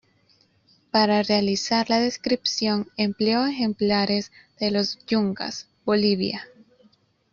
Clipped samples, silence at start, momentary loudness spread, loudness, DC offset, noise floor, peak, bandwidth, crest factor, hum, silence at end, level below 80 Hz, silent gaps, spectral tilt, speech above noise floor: under 0.1%; 0.95 s; 8 LU; -23 LUFS; under 0.1%; -62 dBFS; -6 dBFS; 7.4 kHz; 18 dB; none; 0.85 s; -62 dBFS; none; -4.5 dB/octave; 39 dB